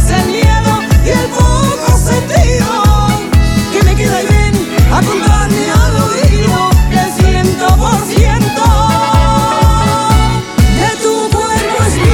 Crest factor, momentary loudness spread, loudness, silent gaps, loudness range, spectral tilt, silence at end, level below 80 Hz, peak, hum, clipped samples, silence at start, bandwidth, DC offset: 8 dB; 2 LU; -10 LUFS; none; 1 LU; -5.5 dB/octave; 0 s; -14 dBFS; 0 dBFS; none; under 0.1%; 0 s; 18 kHz; 0.4%